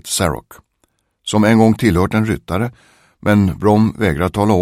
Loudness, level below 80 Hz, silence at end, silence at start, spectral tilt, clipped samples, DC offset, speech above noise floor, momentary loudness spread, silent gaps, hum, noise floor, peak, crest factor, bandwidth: -15 LUFS; -38 dBFS; 0 s; 0.05 s; -6 dB/octave; under 0.1%; under 0.1%; 49 dB; 10 LU; none; none; -64 dBFS; 0 dBFS; 16 dB; 15.5 kHz